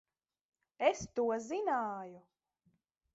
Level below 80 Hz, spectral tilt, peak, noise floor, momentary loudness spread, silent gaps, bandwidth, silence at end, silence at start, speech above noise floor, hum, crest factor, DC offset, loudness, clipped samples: -70 dBFS; -3.5 dB/octave; -16 dBFS; -77 dBFS; 10 LU; none; 8 kHz; 0.95 s; 0.8 s; 42 dB; none; 22 dB; under 0.1%; -35 LUFS; under 0.1%